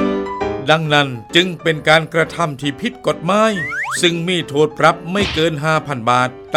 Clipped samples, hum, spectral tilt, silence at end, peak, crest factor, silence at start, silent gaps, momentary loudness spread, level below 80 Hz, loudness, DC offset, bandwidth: under 0.1%; none; -4.5 dB/octave; 0 s; 0 dBFS; 16 dB; 0 s; none; 7 LU; -44 dBFS; -16 LUFS; under 0.1%; 16 kHz